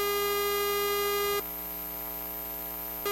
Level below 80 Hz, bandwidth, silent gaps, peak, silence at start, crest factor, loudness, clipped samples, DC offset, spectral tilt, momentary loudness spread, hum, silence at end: -54 dBFS; 16.5 kHz; none; -16 dBFS; 0 s; 14 dB; -30 LUFS; under 0.1%; under 0.1%; -2 dB/octave; 7 LU; none; 0 s